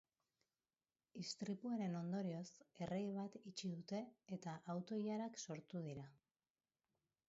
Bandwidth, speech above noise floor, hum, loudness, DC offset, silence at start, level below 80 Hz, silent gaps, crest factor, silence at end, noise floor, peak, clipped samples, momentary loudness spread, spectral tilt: 7.6 kHz; over 42 dB; none; -48 LUFS; under 0.1%; 1.15 s; -84 dBFS; none; 16 dB; 1.15 s; under -90 dBFS; -34 dBFS; under 0.1%; 8 LU; -6.5 dB/octave